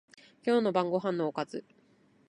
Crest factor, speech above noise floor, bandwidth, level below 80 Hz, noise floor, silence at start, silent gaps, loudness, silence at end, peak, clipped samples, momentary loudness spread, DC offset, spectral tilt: 18 dB; 35 dB; 10.5 kHz; -80 dBFS; -65 dBFS; 0.45 s; none; -31 LUFS; 0.65 s; -14 dBFS; under 0.1%; 11 LU; under 0.1%; -7 dB/octave